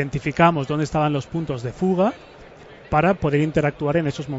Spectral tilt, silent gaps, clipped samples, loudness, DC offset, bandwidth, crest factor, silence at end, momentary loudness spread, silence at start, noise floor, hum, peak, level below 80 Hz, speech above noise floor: -7.5 dB/octave; none; under 0.1%; -21 LUFS; under 0.1%; 8 kHz; 18 dB; 0 s; 8 LU; 0 s; -43 dBFS; none; -2 dBFS; -44 dBFS; 23 dB